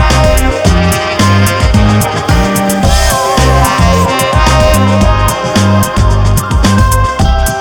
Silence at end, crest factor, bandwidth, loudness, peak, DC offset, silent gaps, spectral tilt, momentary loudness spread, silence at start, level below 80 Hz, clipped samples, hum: 0 s; 8 dB; 18 kHz; -9 LUFS; 0 dBFS; 0.2%; none; -5 dB/octave; 3 LU; 0 s; -14 dBFS; 2%; none